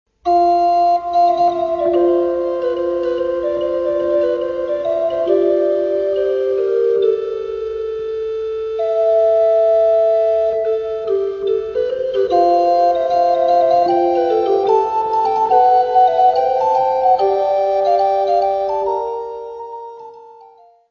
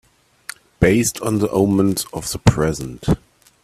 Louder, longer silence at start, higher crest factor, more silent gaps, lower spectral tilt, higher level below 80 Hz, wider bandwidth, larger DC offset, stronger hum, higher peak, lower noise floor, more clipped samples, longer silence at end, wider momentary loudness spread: first, -16 LUFS vs -19 LUFS; second, 0.25 s vs 0.8 s; about the same, 14 dB vs 18 dB; neither; about the same, -6 dB/octave vs -5.5 dB/octave; second, -52 dBFS vs -36 dBFS; second, 6.8 kHz vs 16 kHz; neither; neither; about the same, -2 dBFS vs 0 dBFS; first, -46 dBFS vs -39 dBFS; neither; about the same, 0.45 s vs 0.5 s; second, 9 LU vs 20 LU